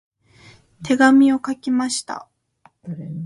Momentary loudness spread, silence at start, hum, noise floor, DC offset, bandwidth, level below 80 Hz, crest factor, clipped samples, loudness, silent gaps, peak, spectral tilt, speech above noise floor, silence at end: 21 LU; 0.8 s; none; -57 dBFS; under 0.1%; 11.5 kHz; -62 dBFS; 18 dB; under 0.1%; -17 LUFS; none; -2 dBFS; -4.5 dB/octave; 39 dB; 0 s